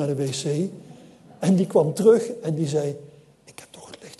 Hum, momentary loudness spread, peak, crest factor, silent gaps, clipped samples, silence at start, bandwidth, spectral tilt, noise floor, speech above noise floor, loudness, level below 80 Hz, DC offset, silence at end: none; 25 LU; -4 dBFS; 18 dB; none; under 0.1%; 0 s; 12.5 kHz; -6.5 dB/octave; -51 dBFS; 29 dB; -22 LUFS; -68 dBFS; under 0.1%; 0.05 s